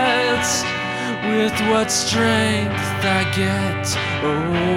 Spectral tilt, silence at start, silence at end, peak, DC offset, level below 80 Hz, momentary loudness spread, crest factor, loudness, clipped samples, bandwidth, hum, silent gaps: -4 dB/octave; 0 s; 0 s; -6 dBFS; under 0.1%; -46 dBFS; 5 LU; 14 dB; -19 LUFS; under 0.1%; 16.5 kHz; none; none